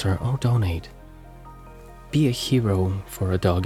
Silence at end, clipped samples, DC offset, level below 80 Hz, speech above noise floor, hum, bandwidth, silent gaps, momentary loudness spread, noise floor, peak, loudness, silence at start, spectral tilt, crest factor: 0 s; under 0.1%; under 0.1%; -44 dBFS; 21 dB; none; 15.5 kHz; none; 23 LU; -43 dBFS; -6 dBFS; -23 LUFS; 0 s; -6.5 dB/octave; 18 dB